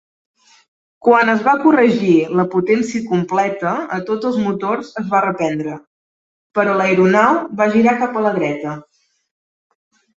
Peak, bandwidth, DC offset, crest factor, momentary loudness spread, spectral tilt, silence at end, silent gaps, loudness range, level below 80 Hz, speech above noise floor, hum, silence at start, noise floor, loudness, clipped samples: 0 dBFS; 8 kHz; under 0.1%; 16 dB; 10 LU; -6.5 dB/octave; 1.35 s; 5.87-6.50 s; 4 LU; -60 dBFS; over 75 dB; none; 1.05 s; under -90 dBFS; -16 LUFS; under 0.1%